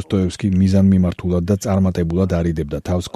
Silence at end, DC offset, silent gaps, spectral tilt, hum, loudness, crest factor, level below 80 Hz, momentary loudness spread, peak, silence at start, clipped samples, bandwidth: 0.1 s; under 0.1%; none; -7.5 dB/octave; none; -18 LUFS; 14 dB; -36 dBFS; 8 LU; -2 dBFS; 0 s; under 0.1%; 12.5 kHz